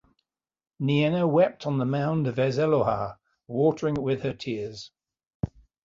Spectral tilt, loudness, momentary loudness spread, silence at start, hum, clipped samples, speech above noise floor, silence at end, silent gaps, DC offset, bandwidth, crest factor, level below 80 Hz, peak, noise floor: -8 dB/octave; -26 LUFS; 13 LU; 0.8 s; none; under 0.1%; 54 dB; 0.4 s; 5.27-5.40 s; under 0.1%; 7.6 kHz; 16 dB; -54 dBFS; -10 dBFS; -79 dBFS